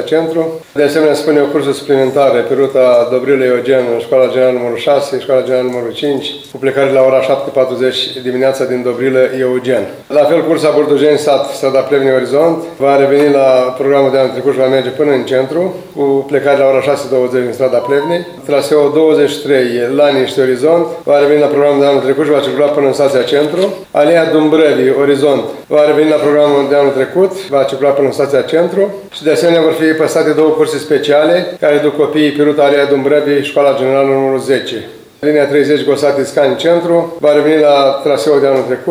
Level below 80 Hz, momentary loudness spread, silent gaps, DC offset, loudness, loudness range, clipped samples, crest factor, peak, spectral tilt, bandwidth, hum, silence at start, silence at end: -60 dBFS; 6 LU; none; under 0.1%; -11 LUFS; 2 LU; under 0.1%; 10 dB; 0 dBFS; -5.5 dB/octave; 16 kHz; none; 0 s; 0 s